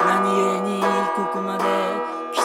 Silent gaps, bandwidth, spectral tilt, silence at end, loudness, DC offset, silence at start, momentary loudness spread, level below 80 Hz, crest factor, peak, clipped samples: none; 16.5 kHz; -4.5 dB/octave; 0 s; -21 LUFS; under 0.1%; 0 s; 6 LU; -78 dBFS; 14 dB; -6 dBFS; under 0.1%